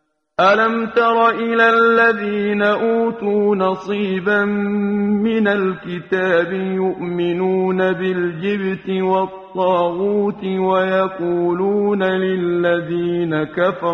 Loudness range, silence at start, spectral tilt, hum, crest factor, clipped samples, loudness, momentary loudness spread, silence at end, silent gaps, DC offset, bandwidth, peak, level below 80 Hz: 4 LU; 0.4 s; -7.5 dB/octave; none; 16 dB; under 0.1%; -17 LUFS; 7 LU; 0 s; none; under 0.1%; 6.6 kHz; -2 dBFS; -58 dBFS